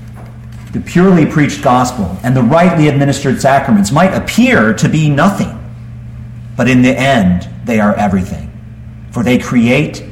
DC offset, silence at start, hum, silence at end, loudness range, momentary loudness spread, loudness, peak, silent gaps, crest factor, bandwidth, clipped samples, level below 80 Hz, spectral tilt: under 0.1%; 0 s; none; 0 s; 3 LU; 20 LU; -11 LUFS; 0 dBFS; none; 12 dB; 16 kHz; under 0.1%; -34 dBFS; -6.5 dB/octave